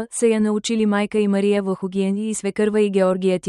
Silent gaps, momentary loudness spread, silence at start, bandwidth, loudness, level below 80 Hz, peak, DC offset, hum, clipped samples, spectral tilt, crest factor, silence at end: none; 5 LU; 0 s; 11.5 kHz; -20 LUFS; -60 dBFS; -6 dBFS; under 0.1%; none; under 0.1%; -5.5 dB/octave; 12 dB; 0 s